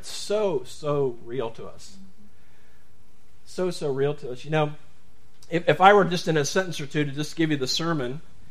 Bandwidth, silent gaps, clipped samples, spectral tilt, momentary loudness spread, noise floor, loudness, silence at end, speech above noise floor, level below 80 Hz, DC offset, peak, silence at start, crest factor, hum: 15.5 kHz; none; under 0.1%; -5 dB/octave; 16 LU; -59 dBFS; -25 LUFS; 0.3 s; 35 dB; -60 dBFS; 2%; 0 dBFS; 0.05 s; 26 dB; none